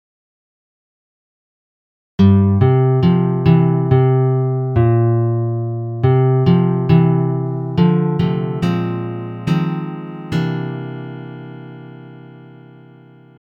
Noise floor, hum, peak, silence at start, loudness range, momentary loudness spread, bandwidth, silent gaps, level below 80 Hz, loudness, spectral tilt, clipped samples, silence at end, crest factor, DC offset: -43 dBFS; none; 0 dBFS; 2.2 s; 10 LU; 17 LU; 5.6 kHz; none; -46 dBFS; -16 LUFS; -10 dB/octave; under 0.1%; 1.05 s; 16 dB; under 0.1%